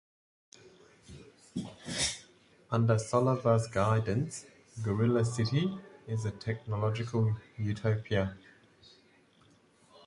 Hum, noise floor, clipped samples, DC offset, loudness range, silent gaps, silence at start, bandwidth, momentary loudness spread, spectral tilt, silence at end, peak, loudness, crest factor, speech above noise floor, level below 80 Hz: none; -64 dBFS; under 0.1%; under 0.1%; 5 LU; none; 0.65 s; 11.5 kHz; 15 LU; -6 dB/octave; 1.7 s; -12 dBFS; -32 LUFS; 20 dB; 34 dB; -58 dBFS